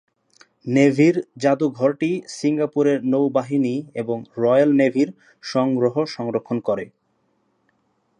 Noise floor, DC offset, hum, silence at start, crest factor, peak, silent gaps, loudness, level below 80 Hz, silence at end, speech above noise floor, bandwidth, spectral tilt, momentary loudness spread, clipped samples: -67 dBFS; under 0.1%; none; 0.65 s; 18 dB; -4 dBFS; none; -20 LUFS; -70 dBFS; 1.3 s; 47 dB; 9.8 kHz; -7 dB/octave; 11 LU; under 0.1%